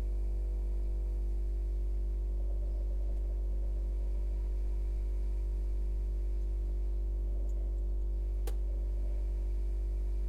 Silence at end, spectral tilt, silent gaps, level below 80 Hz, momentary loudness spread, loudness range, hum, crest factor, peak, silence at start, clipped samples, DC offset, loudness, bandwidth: 0 s; -8.5 dB/octave; none; -32 dBFS; 0 LU; 0 LU; none; 8 dB; -24 dBFS; 0 s; under 0.1%; under 0.1%; -37 LUFS; 2.4 kHz